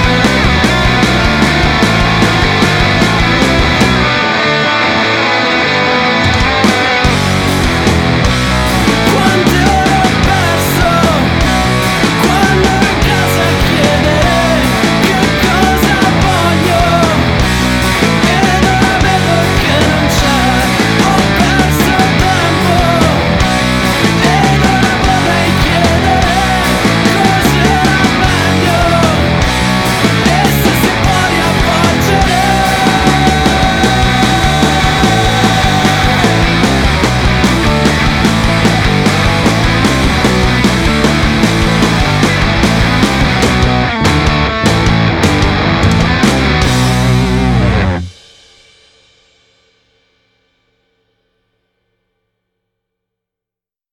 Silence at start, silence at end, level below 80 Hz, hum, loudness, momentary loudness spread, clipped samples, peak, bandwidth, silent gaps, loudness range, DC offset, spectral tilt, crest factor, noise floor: 0 s; 5.8 s; -20 dBFS; none; -10 LUFS; 2 LU; under 0.1%; 0 dBFS; 18 kHz; none; 1 LU; under 0.1%; -5 dB/octave; 10 dB; -87 dBFS